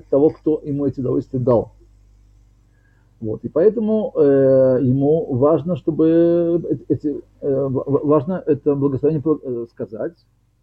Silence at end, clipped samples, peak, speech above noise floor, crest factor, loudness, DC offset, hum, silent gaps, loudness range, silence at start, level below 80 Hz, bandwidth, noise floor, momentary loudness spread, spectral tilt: 0.5 s; under 0.1%; -4 dBFS; 37 dB; 16 dB; -18 LUFS; under 0.1%; none; none; 6 LU; 0.1 s; -50 dBFS; 4.7 kHz; -54 dBFS; 13 LU; -11.5 dB/octave